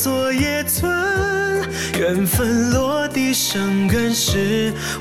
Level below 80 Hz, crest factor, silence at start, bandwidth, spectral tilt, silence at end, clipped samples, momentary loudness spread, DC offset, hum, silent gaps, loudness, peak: -36 dBFS; 14 dB; 0 s; 17 kHz; -4 dB/octave; 0 s; under 0.1%; 3 LU; 0.3%; none; none; -18 LUFS; -4 dBFS